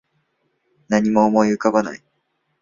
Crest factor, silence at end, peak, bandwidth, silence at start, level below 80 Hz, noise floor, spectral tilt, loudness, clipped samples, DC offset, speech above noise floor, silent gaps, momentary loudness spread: 18 dB; 0.65 s; -2 dBFS; 7.4 kHz; 0.9 s; -58 dBFS; -70 dBFS; -6.5 dB/octave; -18 LUFS; under 0.1%; under 0.1%; 53 dB; none; 12 LU